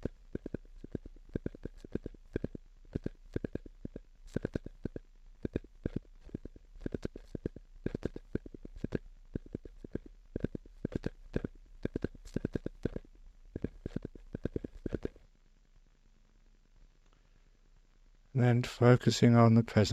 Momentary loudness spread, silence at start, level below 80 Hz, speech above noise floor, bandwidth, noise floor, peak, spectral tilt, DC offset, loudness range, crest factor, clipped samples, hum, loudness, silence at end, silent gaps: 21 LU; 0 s; -50 dBFS; 38 dB; 9.2 kHz; -63 dBFS; -10 dBFS; -7 dB/octave; under 0.1%; 12 LU; 26 dB; under 0.1%; none; -35 LUFS; 0 s; none